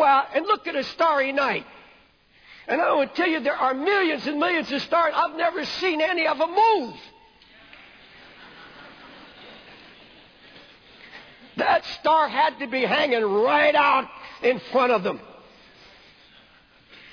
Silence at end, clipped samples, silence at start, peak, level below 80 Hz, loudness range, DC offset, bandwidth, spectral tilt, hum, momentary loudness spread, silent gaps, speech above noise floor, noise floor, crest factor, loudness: 1.8 s; under 0.1%; 0 s; -8 dBFS; -64 dBFS; 6 LU; under 0.1%; 5.4 kHz; -4.5 dB/octave; none; 24 LU; none; 35 dB; -57 dBFS; 16 dB; -22 LUFS